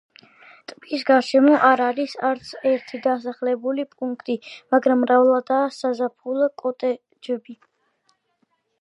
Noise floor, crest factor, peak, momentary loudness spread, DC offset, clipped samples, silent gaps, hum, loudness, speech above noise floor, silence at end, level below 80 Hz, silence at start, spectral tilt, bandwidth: -69 dBFS; 18 dB; -2 dBFS; 14 LU; under 0.1%; under 0.1%; none; none; -21 LUFS; 49 dB; 1.25 s; -76 dBFS; 0.7 s; -4.5 dB/octave; 10 kHz